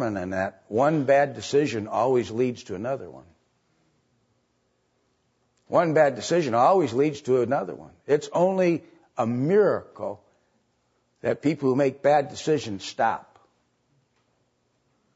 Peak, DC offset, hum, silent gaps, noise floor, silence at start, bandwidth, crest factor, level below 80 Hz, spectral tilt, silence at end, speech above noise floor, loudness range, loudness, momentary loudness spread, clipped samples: -6 dBFS; under 0.1%; none; none; -71 dBFS; 0 s; 8 kHz; 18 dB; -70 dBFS; -6 dB/octave; 1.95 s; 47 dB; 7 LU; -24 LUFS; 13 LU; under 0.1%